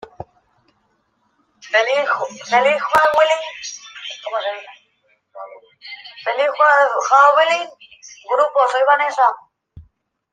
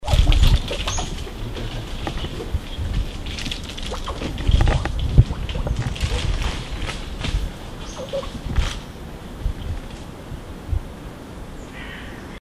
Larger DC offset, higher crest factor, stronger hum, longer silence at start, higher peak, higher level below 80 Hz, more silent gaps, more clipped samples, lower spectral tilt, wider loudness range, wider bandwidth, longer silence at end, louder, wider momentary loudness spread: neither; about the same, 18 dB vs 22 dB; neither; first, 0.2 s vs 0 s; about the same, -2 dBFS vs 0 dBFS; second, -60 dBFS vs -24 dBFS; neither; neither; second, -1.5 dB/octave vs -5 dB/octave; about the same, 6 LU vs 8 LU; first, 15.5 kHz vs 13.5 kHz; first, 0.5 s vs 0.05 s; first, -16 LUFS vs -25 LUFS; first, 22 LU vs 17 LU